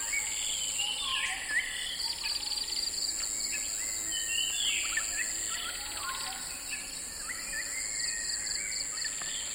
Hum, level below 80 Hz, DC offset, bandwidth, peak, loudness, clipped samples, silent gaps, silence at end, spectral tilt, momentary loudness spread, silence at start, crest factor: none; -56 dBFS; under 0.1%; over 20 kHz; -18 dBFS; -31 LUFS; under 0.1%; none; 0 s; 2 dB/octave; 6 LU; 0 s; 16 dB